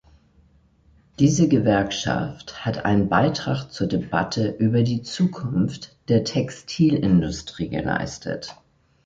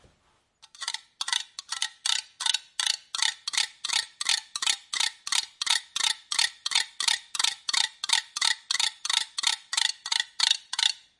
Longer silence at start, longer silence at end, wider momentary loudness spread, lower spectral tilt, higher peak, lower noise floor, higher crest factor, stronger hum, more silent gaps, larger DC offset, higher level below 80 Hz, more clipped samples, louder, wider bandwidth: first, 1.2 s vs 0.8 s; first, 0.55 s vs 0.2 s; first, 11 LU vs 5 LU; first, -6 dB/octave vs 4.5 dB/octave; about the same, -4 dBFS vs -6 dBFS; second, -57 dBFS vs -68 dBFS; second, 18 dB vs 24 dB; neither; neither; neither; first, -46 dBFS vs -78 dBFS; neither; first, -22 LUFS vs -26 LUFS; second, 7.8 kHz vs 11.5 kHz